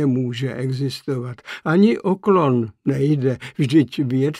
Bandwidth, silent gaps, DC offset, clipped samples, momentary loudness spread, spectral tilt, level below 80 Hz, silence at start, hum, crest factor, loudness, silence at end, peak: 12.5 kHz; none; under 0.1%; under 0.1%; 10 LU; -8 dB/octave; -60 dBFS; 0 s; none; 16 dB; -20 LUFS; 0 s; -4 dBFS